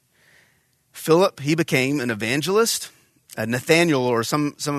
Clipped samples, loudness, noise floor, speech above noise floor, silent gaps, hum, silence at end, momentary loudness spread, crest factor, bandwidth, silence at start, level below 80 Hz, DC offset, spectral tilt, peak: under 0.1%; -20 LUFS; -63 dBFS; 43 dB; none; none; 0 s; 11 LU; 20 dB; 14 kHz; 0.95 s; -64 dBFS; under 0.1%; -4.5 dB/octave; -2 dBFS